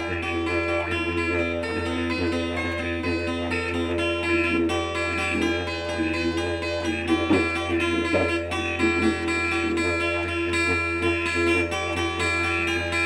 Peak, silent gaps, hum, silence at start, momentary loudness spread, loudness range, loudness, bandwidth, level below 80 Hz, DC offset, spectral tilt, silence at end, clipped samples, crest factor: -8 dBFS; none; none; 0 s; 5 LU; 2 LU; -24 LUFS; 12 kHz; -42 dBFS; under 0.1%; -5 dB/octave; 0 s; under 0.1%; 16 dB